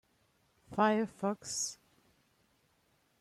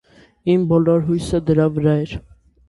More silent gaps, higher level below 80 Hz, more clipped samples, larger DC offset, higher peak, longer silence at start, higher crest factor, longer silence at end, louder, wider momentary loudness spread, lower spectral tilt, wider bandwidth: neither; second, -76 dBFS vs -42 dBFS; neither; neither; second, -16 dBFS vs -2 dBFS; first, 0.7 s vs 0.45 s; first, 22 dB vs 16 dB; first, 1.45 s vs 0.5 s; second, -34 LUFS vs -18 LUFS; about the same, 9 LU vs 11 LU; second, -3.5 dB/octave vs -8.5 dB/octave; first, 13.5 kHz vs 11.5 kHz